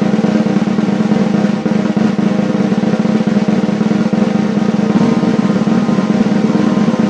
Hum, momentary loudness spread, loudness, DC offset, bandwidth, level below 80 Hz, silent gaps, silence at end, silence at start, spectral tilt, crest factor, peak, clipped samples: none; 2 LU; -13 LUFS; under 0.1%; 8.4 kHz; -50 dBFS; none; 0 s; 0 s; -7.5 dB/octave; 12 dB; 0 dBFS; under 0.1%